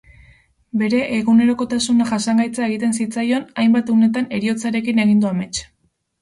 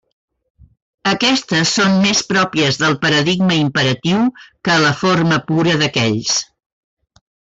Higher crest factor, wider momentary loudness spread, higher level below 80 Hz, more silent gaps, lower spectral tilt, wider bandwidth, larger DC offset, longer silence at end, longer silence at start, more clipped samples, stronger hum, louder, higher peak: about the same, 12 dB vs 12 dB; about the same, 6 LU vs 5 LU; about the same, -54 dBFS vs -52 dBFS; neither; about the same, -5 dB/octave vs -4 dB/octave; first, 11.5 kHz vs 8 kHz; neither; second, 0.55 s vs 1.15 s; second, 0.75 s vs 1.05 s; neither; neither; second, -18 LUFS vs -15 LUFS; about the same, -6 dBFS vs -4 dBFS